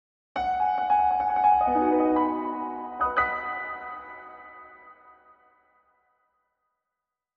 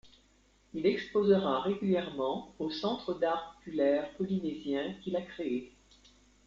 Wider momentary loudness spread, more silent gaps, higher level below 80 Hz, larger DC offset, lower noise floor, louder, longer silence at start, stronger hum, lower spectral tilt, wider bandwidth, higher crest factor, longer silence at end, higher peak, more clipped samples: first, 21 LU vs 10 LU; neither; first, -56 dBFS vs -66 dBFS; neither; first, -87 dBFS vs -66 dBFS; first, -25 LUFS vs -32 LUFS; first, 0.35 s vs 0.05 s; neither; about the same, -7 dB/octave vs -7 dB/octave; second, 5.8 kHz vs 7.6 kHz; about the same, 18 dB vs 18 dB; first, 2.45 s vs 0.8 s; first, -10 dBFS vs -14 dBFS; neither